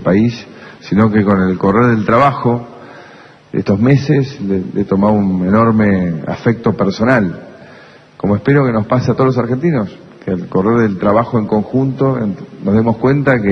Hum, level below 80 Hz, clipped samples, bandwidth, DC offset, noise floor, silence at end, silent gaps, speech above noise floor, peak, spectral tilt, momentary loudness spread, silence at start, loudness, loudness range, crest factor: none; -44 dBFS; under 0.1%; 6.4 kHz; under 0.1%; -40 dBFS; 0 s; none; 27 dB; 0 dBFS; -9 dB/octave; 10 LU; 0 s; -14 LUFS; 2 LU; 14 dB